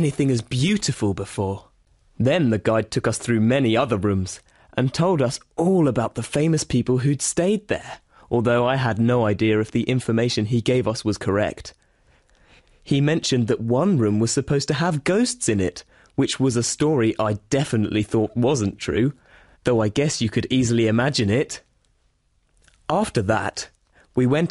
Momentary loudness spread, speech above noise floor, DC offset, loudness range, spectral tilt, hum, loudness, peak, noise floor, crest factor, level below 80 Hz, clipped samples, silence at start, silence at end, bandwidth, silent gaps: 8 LU; 44 dB; under 0.1%; 3 LU; -5.5 dB/octave; none; -21 LUFS; -8 dBFS; -64 dBFS; 14 dB; -50 dBFS; under 0.1%; 0 s; 0 s; 11.5 kHz; none